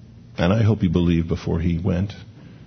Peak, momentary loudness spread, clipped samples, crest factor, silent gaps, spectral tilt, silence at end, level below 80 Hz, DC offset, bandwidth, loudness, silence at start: -4 dBFS; 11 LU; under 0.1%; 16 dB; none; -8.5 dB/octave; 0.05 s; -38 dBFS; under 0.1%; 6.4 kHz; -21 LUFS; 0.3 s